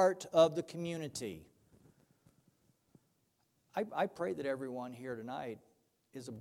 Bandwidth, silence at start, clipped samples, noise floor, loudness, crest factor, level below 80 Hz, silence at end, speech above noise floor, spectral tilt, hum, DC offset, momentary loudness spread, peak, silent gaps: 16 kHz; 0 s; under 0.1%; -78 dBFS; -37 LUFS; 24 dB; -76 dBFS; 0 s; 42 dB; -5 dB/octave; none; under 0.1%; 20 LU; -14 dBFS; none